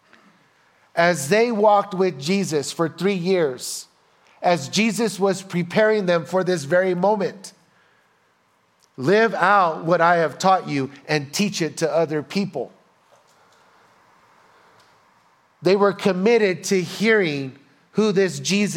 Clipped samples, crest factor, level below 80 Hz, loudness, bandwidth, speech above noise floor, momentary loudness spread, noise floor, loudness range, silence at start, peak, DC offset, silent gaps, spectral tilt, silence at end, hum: under 0.1%; 20 dB; -72 dBFS; -20 LUFS; 16.5 kHz; 43 dB; 10 LU; -62 dBFS; 7 LU; 0.95 s; -2 dBFS; under 0.1%; none; -5 dB/octave; 0 s; none